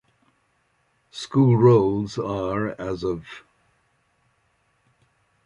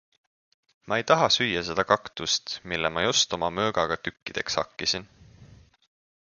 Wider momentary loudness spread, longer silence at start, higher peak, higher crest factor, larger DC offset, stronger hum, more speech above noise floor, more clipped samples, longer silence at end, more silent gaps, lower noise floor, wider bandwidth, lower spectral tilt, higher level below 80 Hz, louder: first, 22 LU vs 9 LU; first, 1.15 s vs 0.85 s; about the same, -4 dBFS vs -2 dBFS; about the same, 20 dB vs 24 dB; neither; neither; first, 47 dB vs 26 dB; neither; first, 2.1 s vs 0.8 s; second, none vs 4.22-4.26 s; first, -67 dBFS vs -53 dBFS; about the same, 10.5 kHz vs 10 kHz; first, -8 dB/octave vs -2.5 dB/octave; about the same, -54 dBFS vs -56 dBFS; first, -21 LUFS vs -25 LUFS